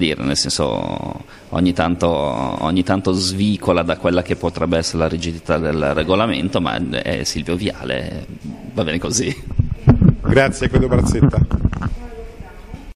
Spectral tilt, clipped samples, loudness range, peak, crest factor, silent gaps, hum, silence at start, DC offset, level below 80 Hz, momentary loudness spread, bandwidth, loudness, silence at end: -5.5 dB/octave; under 0.1%; 4 LU; 0 dBFS; 18 dB; none; none; 0 s; under 0.1%; -30 dBFS; 13 LU; 13 kHz; -18 LUFS; 0.05 s